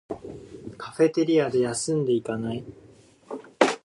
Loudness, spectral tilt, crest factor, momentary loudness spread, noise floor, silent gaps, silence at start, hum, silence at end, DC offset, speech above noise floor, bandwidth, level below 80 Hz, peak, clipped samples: -24 LUFS; -5 dB/octave; 24 dB; 19 LU; -47 dBFS; none; 0.1 s; none; 0.05 s; under 0.1%; 22 dB; 11.5 kHz; -60 dBFS; -2 dBFS; under 0.1%